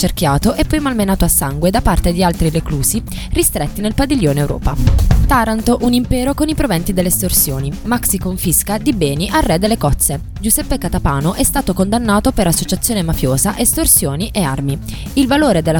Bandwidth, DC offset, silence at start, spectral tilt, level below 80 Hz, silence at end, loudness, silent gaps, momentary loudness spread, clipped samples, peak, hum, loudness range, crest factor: 19.5 kHz; under 0.1%; 0 s; -4.5 dB/octave; -22 dBFS; 0 s; -15 LUFS; none; 5 LU; under 0.1%; 0 dBFS; none; 1 LU; 14 dB